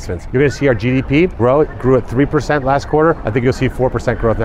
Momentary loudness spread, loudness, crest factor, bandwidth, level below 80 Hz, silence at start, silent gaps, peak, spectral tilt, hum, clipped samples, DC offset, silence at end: 3 LU; -15 LUFS; 12 dB; 12 kHz; -28 dBFS; 0 s; none; -2 dBFS; -7.5 dB/octave; none; under 0.1%; under 0.1%; 0 s